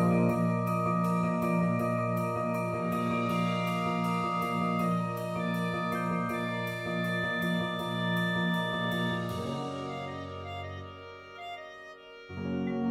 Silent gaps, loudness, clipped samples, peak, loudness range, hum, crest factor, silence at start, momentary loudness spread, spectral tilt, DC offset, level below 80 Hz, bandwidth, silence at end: none; -31 LUFS; under 0.1%; -16 dBFS; 7 LU; none; 16 dB; 0 s; 13 LU; -6.5 dB/octave; under 0.1%; -64 dBFS; 15.5 kHz; 0 s